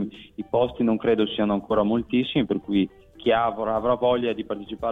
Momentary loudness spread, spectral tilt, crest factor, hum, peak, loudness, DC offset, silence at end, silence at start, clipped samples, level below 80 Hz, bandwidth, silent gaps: 8 LU; -8.5 dB/octave; 14 dB; none; -10 dBFS; -24 LUFS; under 0.1%; 0 s; 0 s; under 0.1%; -52 dBFS; 4.5 kHz; none